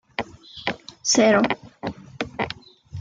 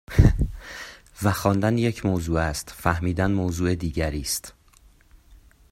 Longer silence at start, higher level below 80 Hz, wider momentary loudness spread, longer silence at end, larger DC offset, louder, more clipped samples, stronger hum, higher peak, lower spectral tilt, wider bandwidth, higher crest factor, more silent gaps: about the same, 0.2 s vs 0.1 s; second, -56 dBFS vs -32 dBFS; first, 18 LU vs 14 LU; second, 0 s vs 0.35 s; neither; about the same, -23 LUFS vs -24 LUFS; neither; neither; about the same, -6 dBFS vs -4 dBFS; second, -3 dB/octave vs -6 dB/octave; second, 9.6 kHz vs 16 kHz; about the same, 20 dB vs 20 dB; neither